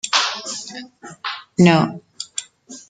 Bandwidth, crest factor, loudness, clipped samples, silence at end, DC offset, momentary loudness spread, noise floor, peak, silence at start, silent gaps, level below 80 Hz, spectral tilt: 9.4 kHz; 20 dB; -20 LUFS; under 0.1%; 0.1 s; under 0.1%; 21 LU; -41 dBFS; -2 dBFS; 0.05 s; none; -60 dBFS; -4.5 dB/octave